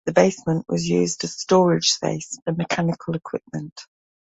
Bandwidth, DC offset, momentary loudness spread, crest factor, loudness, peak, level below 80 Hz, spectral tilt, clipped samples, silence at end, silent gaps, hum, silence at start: 8 kHz; under 0.1%; 13 LU; 20 dB; -22 LUFS; -2 dBFS; -58 dBFS; -4.5 dB/octave; under 0.1%; 0.5 s; 2.42-2.46 s, 3.72-3.76 s; none; 0.05 s